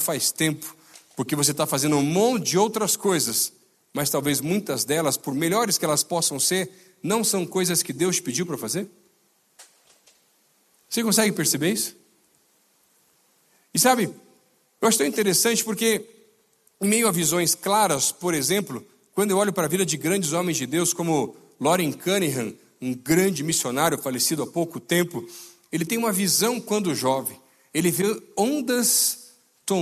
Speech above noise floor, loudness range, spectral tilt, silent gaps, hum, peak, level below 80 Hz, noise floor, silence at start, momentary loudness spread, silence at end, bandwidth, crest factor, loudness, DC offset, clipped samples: 41 dB; 4 LU; -3 dB/octave; none; none; -4 dBFS; -66 dBFS; -64 dBFS; 0 s; 10 LU; 0 s; 14.5 kHz; 20 dB; -23 LUFS; under 0.1%; under 0.1%